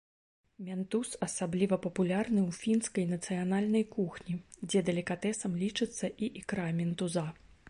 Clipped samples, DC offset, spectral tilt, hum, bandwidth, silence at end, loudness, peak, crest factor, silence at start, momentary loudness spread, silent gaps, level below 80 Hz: under 0.1%; under 0.1%; -5.5 dB/octave; none; 11.5 kHz; 0 s; -33 LUFS; -18 dBFS; 16 dB; 0.6 s; 8 LU; none; -66 dBFS